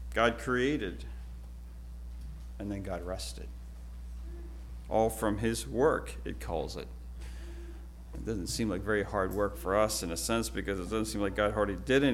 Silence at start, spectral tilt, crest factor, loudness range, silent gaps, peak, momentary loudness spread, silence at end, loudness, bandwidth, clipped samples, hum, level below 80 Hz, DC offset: 0 s; -4.5 dB/octave; 22 dB; 11 LU; none; -12 dBFS; 17 LU; 0 s; -32 LUFS; 16.5 kHz; under 0.1%; none; -42 dBFS; under 0.1%